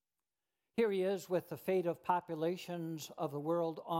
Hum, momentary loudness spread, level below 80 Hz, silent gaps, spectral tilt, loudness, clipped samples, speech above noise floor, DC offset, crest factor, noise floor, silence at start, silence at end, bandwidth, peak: none; 8 LU; -84 dBFS; none; -6 dB/octave; -37 LUFS; under 0.1%; over 54 dB; under 0.1%; 18 dB; under -90 dBFS; 0.75 s; 0 s; 16.5 kHz; -18 dBFS